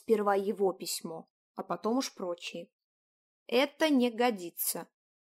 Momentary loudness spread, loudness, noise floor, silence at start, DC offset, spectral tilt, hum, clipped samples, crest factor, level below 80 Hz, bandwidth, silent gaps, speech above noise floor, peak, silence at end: 16 LU; -31 LUFS; under -90 dBFS; 0.1 s; under 0.1%; -3.5 dB/octave; none; under 0.1%; 18 dB; -86 dBFS; 16 kHz; 1.30-1.55 s, 2.73-3.46 s; over 59 dB; -14 dBFS; 0.35 s